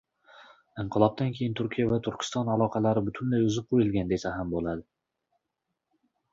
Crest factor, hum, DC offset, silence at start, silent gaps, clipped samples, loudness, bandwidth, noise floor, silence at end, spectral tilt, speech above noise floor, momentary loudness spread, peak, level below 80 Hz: 22 dB; none; under 0.1%; 0.4 s; none; under 0.1%; -28 LUFS; 8 kHz; -83 dBFS; 1.5 s; -7 dB/octave; 56 dB; 7 LU; -8 dBFS; -54 dBFS